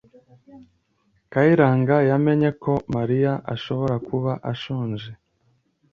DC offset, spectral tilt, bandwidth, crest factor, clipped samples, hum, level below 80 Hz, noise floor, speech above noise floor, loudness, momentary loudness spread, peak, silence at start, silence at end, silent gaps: under 0.1%; -9 dB/octave; 6.8 kHz; 20 dB; under 0.1%; none; -56 dBFS; -66 dBFS; 46 dB; -21 LUFS; 11 LU; -2 dBFS; 0.55 s; 0.8 s; none